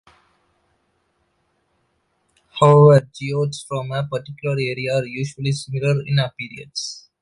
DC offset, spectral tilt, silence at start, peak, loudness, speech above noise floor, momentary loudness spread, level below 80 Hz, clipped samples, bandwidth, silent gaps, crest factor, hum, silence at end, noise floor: under 0.1%; -6.5 dB/octave; 2.55 s; -2 dBFS; -19 LUFS; 49 dB; 16 LU; -58 dBFS; under 0.1%; 11 kHz; none; 20 dB; none; 0.2 s; -67 dBFS